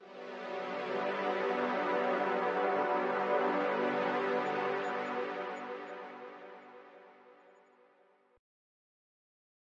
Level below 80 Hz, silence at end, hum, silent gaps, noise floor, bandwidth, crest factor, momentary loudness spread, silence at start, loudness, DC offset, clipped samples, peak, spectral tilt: under -90 dBFS; 2.4 s; none; none; -68 dBFS; 7.8 kHz; 16 dB; 16 LU; 0 s; -34 LUFS; under 0.1%; under 0.1%; -20 dBFS; -6 dB/octave